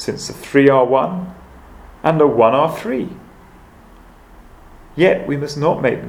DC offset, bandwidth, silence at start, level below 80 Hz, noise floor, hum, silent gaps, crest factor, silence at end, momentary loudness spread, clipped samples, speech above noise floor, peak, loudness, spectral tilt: under 0.1%; 16 kHz; 0 s; -46 dBFS; -43 dBFS; none; none; 18 dB; 0 s; 15 LU; under 0.1%; 28 dB; 0 dBFS; -16 LUFS; -6.5 dB/octave